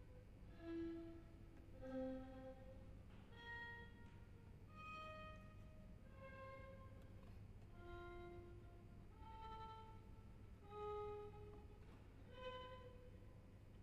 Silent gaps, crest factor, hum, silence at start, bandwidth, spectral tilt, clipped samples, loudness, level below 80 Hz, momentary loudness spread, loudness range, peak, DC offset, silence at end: none; 18 dB; none; 0 s; 14 kHz; -7 dB/octave; under 0.1%; -58 LUFS; -64 dBFS; 12 LU; 5 LU; -38 dBFS; under 0.1%; 0 s